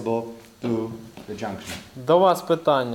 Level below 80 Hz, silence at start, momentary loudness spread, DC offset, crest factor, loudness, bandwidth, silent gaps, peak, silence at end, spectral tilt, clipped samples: -60 dBFS; 0 s; 18 LU; under 0.1%; 18 dB; -23 LUFS; 17.5 kHz; none; -6 dBFS; 0 s; -6 dB/octave; under 0.1%